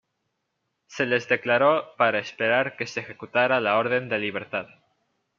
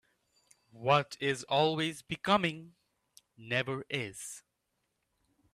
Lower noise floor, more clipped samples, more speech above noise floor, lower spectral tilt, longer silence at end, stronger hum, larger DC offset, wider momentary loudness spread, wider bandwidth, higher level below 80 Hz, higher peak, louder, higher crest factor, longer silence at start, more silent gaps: second, -78 dBFS vs -82 dBFS; neither; first, 54 dB vs 49 dB; about the same, -5 dB/octave vs -4.5 dB/octave; second, 0.75 s vs 1.15 s; neither; neither; second, 11 LU vs 14 LU; second, 7.2 kHz vs 14.5 kHz; about the same, -74 dBFS vs -72 dBFS; first, -4 dBFS vs -12 dBFS; first, -24 LUFS vs -32 LUFS; about the same, 20 dB vs 22 dB; first, 0.9 s vs 0.75 s; neither